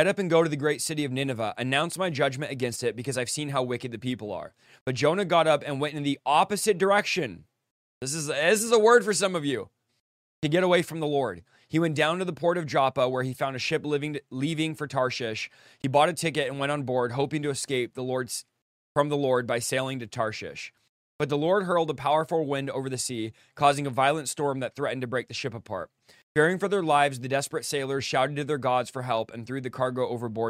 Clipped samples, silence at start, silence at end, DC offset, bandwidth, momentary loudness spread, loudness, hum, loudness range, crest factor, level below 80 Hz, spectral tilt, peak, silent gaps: under 0.1%; 0 s; 0 s; under 0.1%; 16 kHz; 11 LU; -27 LUFS; none; 4 LU; 20 dB; -68 dBFS; -4.5 dB/octave; -6 dBFS; 4.81-4.86 s, 7.71-8.01 s, 10.00-10.42 s, 18.62-18.95 s, 20.89-21.19 s, 26.23-26.35 s